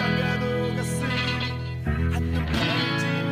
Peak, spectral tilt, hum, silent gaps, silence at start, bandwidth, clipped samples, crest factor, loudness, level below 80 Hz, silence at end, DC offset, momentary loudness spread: -12 dBFS; -5.5 dB/octave; none; none; 0 s; 15.5 kHz; under 0.1%; 14 dB; -25 LUFS; -36 dBFS; 0 s; under 0.1%; 4 LU